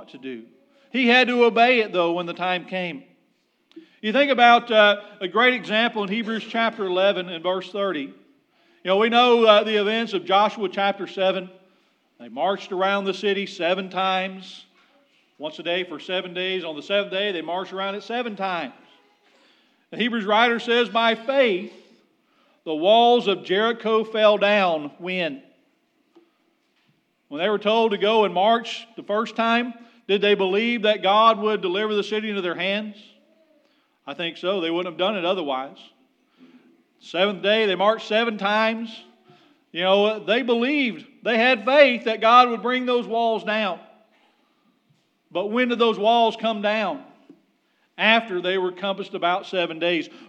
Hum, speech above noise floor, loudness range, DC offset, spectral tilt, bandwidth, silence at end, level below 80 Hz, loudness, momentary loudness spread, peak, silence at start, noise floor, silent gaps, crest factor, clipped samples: none; 45 dB; 8 LU; under 0.1%; -5 dB/octave; 8.8 kHz; 0.05 s; under -90 dBFS; -21 LUFS; 14 LU; 0 dBFS; 0 s; -67 dBFS; none; 22 dB; under 0.1%